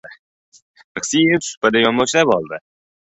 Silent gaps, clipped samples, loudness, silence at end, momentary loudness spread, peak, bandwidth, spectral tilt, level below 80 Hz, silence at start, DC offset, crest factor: 0.19-0.52 s, 0.62-0.74 s, 0.84-0.95 s, 1.57-1.61 s; under 0.1%; -16 LUFS; 0.45 s; 16 LU; -2 dBFS; 8.4 kHz; -3.5 dB/octave; -58 dBFS; 0.05 s; under 0.1%; 18 dB